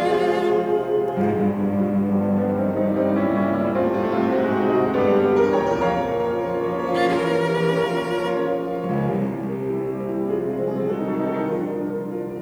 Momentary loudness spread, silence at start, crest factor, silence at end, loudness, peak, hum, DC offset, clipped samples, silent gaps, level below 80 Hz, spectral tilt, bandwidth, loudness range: 6 LU; 0 s; 14 dB; 0 s; -22 LUFS; -8 dBFS; none; under 0.1%; under 0.1%; none; -54 dBFS; -7.5 dB/octave; over 20 kHz; 4 LU